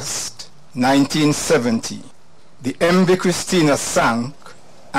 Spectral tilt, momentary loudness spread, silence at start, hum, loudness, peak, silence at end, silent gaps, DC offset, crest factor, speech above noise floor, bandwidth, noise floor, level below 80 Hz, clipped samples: -4.5 dB/octave; 14 LU; 0 s; none; -17 LUFS; -6 dBFS; 0 s; none; 1%; 12 dB; 27 dB; 16 kHz; -44 dBFS; -50 dBFS; under 0.1%